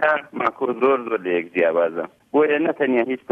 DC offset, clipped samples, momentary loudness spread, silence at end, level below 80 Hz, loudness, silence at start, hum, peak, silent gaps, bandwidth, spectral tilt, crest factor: under 0.1%; under 0.1%; 4 LU; 0.15 s; -68 dBFS; -21 LUFS; 0 s; none; -6 dBFS; none; 5.2 kHz; -7.5 dB/octave; 16 dB